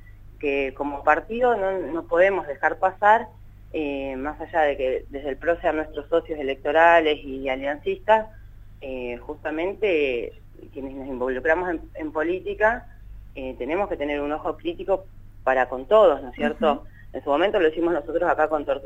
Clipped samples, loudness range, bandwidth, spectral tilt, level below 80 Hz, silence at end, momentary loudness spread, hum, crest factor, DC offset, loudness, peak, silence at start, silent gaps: under 0.1%; 5 LU; 7.8 kHz; -6.5 dB/octave; -44 dBFS; 0 s; 14 LU; none; 22 dB; under 0.1%; -23 LUFS; -2 dBFS; 0.05 s; none